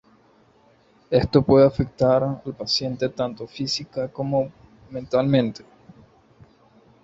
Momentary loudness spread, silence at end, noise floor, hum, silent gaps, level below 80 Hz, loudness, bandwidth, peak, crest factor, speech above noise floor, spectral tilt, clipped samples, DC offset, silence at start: 14 LU; 1.45 s; -57 dBFS; none; none; -48 dBFS; -22 LUFS; 8 kHz; -2 dBFS; 20 dB; 36 dB; -6.5 dB/octave; under 0.1%; under 0.1%; 1.1 s